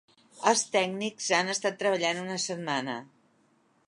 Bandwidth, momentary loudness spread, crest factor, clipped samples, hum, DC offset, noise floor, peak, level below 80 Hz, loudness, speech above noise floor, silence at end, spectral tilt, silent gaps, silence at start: 11.5 kHz; 7 LU; 24 dB; under 0.1%; none; under 0.1%; -67 dBFS; -6 dBFS; -82 dBFS; -28 LUFS; 38 dB; 0.8 s; -2.5 dB/octave; none; 0.35 s